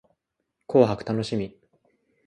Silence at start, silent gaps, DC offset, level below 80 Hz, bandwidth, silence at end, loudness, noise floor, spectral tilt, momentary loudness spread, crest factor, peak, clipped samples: 0.7 s; none; under 0.1%; -58 dBFS; 10.5 kHz; 0.75 s; -24 LUFS; -79 dBFS; -7.5 dB/octave; 11 LU; 22 dB; -4 dBFS; under 0.1%